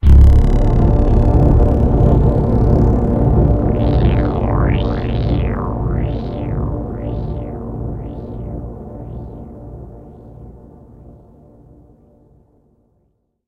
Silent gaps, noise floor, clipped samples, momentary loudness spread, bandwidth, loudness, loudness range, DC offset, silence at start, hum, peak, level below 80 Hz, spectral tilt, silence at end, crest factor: none; -63 dBFS; under 0.1%; 18 LU; 4.9 kHz; -16 LUFS; 19 LU; under 0.1%; 0.05 s; none; 0 dBFS; -18 dBFS; -10 dB/octave; 2.9 s; 14 dB